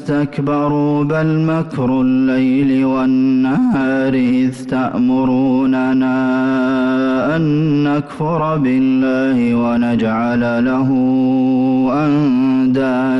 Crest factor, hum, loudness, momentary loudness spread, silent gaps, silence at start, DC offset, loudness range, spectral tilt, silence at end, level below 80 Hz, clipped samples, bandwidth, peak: 6 dB; none; -15 LUFS; 3 LU; none; 0 s; under 0.1%; 1 LU; -8.5 dB/octave; 0 s; -48 dBFS; under 0.1%; 6 kHz; -8 dBFS